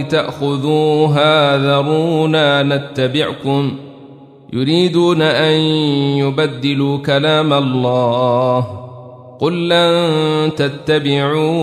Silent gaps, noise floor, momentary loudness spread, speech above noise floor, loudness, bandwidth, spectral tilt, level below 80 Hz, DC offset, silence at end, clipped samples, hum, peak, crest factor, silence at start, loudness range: none; -39 dBFS; 7 LU; 25 dB; -14 LUFS; 13.5 kHz; -6.5 dB/octave; -56 dBFS; under 0.1%; 0 s; under 0.1%; none; -2 dBFS; 12 dB; 0 s; 2 LU